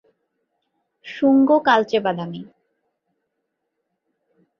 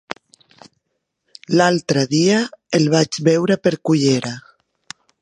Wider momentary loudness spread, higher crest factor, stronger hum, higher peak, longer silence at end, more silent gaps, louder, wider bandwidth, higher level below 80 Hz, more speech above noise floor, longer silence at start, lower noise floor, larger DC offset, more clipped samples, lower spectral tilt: about the same, 19 LU vs 19 LU; about the same, 20 dB vs 18 dB; neither; second, -4 dBFS vs 0 dBFS; first, 2.15 s vs 0.85 s; neither; about the same, -18 LUFS vs -17 LUFS; second, 6.6 kHz vs 11 kHz; second, -70 dBFS vs -62 dBFS; about the same, 59 dB vs 58 dB; second, 1.05 s vs 1.5 s; about the same, -77 dBFS vs -74 dBFS; neither; neither; first, -6.5 dB/octave vs -5 dB/octave